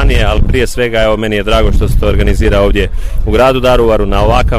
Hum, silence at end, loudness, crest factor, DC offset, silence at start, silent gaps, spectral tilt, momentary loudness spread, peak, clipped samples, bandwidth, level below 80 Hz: none; 0 s; -11 LUFS; 8 dB; under 0.1%; 0 s; none; -6 dB/octave; 4 LU; 0 dBFS; under 0.1%; 15 kHz; -12 dBFS